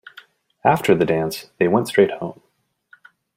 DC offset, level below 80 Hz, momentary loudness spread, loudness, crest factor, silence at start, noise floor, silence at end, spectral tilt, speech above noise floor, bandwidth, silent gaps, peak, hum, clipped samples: under 0.1%; -58 dBFS; 11 LU; -19 LUFS; 20 dB; 0.65 s; -56 dBFS; 1.05 s; -6 dB/octave; 37 dB; 16 kHz; none; -2 dBFS; none; under 0.1%